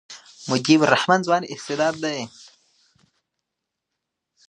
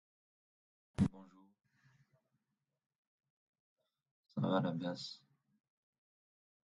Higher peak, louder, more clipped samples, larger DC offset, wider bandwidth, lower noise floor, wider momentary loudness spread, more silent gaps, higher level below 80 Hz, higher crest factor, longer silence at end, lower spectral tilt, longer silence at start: first, 0 dBFS vs -20 dBFS; first, -20 LUFS vs -39 LUFS; neither; neither; first, 10.5 kHz vs 8.8 kHz; second, -82 dBFS vs -88 dBFS; first, 19 LU vs 14 LU; second, none vs 2.86-2.90 s, 2.98-3.18 s, 3.30-3.53 s, 3.60-3.76 s, 4.11-4.24 s; about the same, -68 dBFS vs -64 dBFS; about the same, 24 dB vs 24 dB; first, 2.2 s vs 1.5 s; second, -4.5 dB/octave vs -7.5 dB/octave; second, 0.1 s vs 1 s